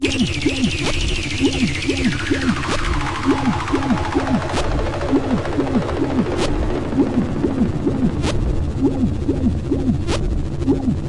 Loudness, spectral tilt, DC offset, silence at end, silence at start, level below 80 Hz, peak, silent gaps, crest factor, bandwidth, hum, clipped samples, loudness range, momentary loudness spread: -20 LUFS; -5.5 dB/octave; 0.2%; 0 s; 0 s; -28 dBFS; -4 dBFS; none; 14 dB; 11.5 kHz; none; under 0.1%; 1 LU; 3 LU